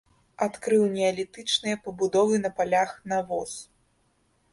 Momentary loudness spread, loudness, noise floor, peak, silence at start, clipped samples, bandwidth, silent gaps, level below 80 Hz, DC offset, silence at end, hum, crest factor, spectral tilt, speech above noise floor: 9 LU; -26 LUFS; -68 dBFS; -10 dBFS; 0.4 s; under 0.1%; 11.5 kHz; none; -66 dBFS; under 0.1%; 0.9 s; none; 16 dB; -4 dB/octave; 42 dB